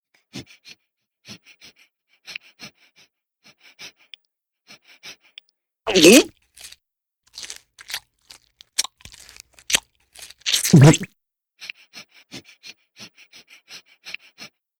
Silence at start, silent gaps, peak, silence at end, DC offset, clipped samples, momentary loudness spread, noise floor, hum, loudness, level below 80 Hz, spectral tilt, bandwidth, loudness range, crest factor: 0.35 s; none; 0 dBFS; 0.7 s; under 0.1%; under 0.1%; 31 LU; -77 dBFS; none; -17 LUFS; -54 dBFS; -4.5 dB/octave; 18 kHz; 22 LU; 22 dB